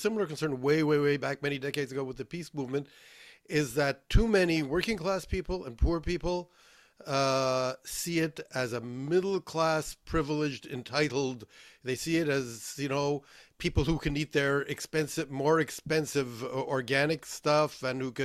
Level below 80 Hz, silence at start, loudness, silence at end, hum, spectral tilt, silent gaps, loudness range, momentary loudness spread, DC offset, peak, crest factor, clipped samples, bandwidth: -42 dBFS; 0 s; -31 LUFS; 0 s; none; -5 dB/octave; none; 2 LU; 9 LU; under 0.1%; -10 dBFS; 20 dB; under 0.1%; 15.5 kHz